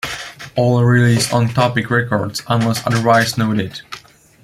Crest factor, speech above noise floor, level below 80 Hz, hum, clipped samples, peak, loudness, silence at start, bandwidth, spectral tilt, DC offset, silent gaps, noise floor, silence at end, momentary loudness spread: 16 dB; 23 dB; -50 dBFS; none; under 0.1%; -2 dBFS; -16 LUFS; 0.05 s; 15 kHz; -5.5 dB/octave; under 0.1%; none; -38 dBFS; 0.45 s; 14 LU